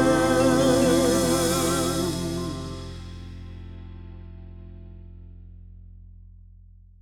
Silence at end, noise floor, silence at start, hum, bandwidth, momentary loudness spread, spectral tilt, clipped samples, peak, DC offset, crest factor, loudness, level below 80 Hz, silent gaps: 0.85 s; -49 dBFS; 0 s; 60 Hz at -55 dBFS; 20 kHz; 25 LU; -4.5 dB/octave; under 0.1%; -8 dBFS; under 0.1%; 18 dB; -22 LUFS; -42 dBFS; none